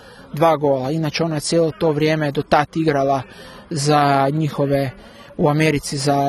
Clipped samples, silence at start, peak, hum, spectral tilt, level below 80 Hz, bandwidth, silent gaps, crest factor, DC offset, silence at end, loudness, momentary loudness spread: under 0.1%; 0.05 s; 0 dBFS; none; -5.5 dB/octave; -48 dBFS; 13.5 kHz; none; 18 dB; under 0.1%; 0 s; -18 LUFS; 9 LU